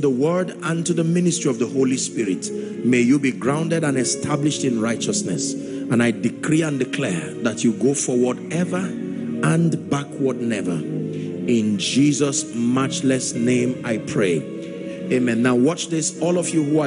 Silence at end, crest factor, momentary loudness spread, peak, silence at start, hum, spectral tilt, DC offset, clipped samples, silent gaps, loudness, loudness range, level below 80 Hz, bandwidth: 0 s; 14 dB; 7 LU; -6 dBFS; 0 s; none; -5 dB/octave; under 0.1%; under 0.1%; none; -21 LUFS; 2 LU; -60 dBFS; 11 kHz